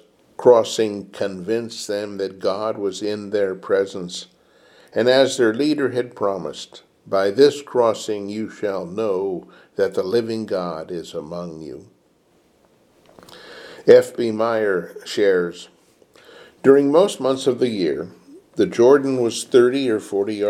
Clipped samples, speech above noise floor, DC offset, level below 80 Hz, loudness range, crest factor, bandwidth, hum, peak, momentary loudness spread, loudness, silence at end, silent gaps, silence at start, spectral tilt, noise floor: under 0.1%; 40 dB; under 0.1%; -66 dBFS; 7 LU; 20 dB; 14 kHz; none; 0 dBFS; 17 LU; -20 LUFS; 0 s; none; 0.4 s; -5 dB/octave; -59 dBFS